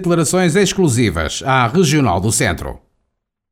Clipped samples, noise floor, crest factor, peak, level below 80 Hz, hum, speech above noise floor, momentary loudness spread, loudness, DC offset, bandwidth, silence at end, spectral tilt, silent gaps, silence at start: under 0.1%; -72 dBFS; 14 dB; -2 dBFS; -36 dBFS; none; 57 dB; 6 LU; -15 LUFS; under 0.1%; 16.5 kHz; 0.75 s; -4.5 dB/octave; none; 0 s